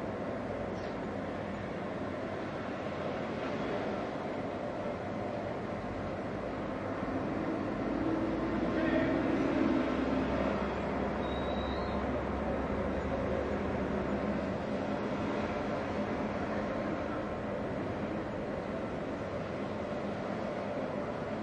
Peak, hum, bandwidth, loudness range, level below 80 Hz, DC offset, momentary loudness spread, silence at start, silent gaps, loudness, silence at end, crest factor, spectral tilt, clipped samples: -18 dBFS; none; 9.8 kHz; 5 LU; -50 dBFS; under 0.1%; 7 LU; 0 s; none; -35 LUFS; 0 s; 16 dB; -7.5 dB/octave; under 0.1%